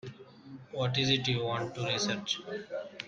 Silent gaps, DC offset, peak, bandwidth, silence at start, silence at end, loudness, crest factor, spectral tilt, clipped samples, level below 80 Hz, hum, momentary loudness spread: none; under 0.1%; -14 dBFS; 9 kHz; 0.05 s; 0 s; -31 LUFS; 20 dB; -4 dB/octave; under 0.1%; -64 dBFS; none; 18 LU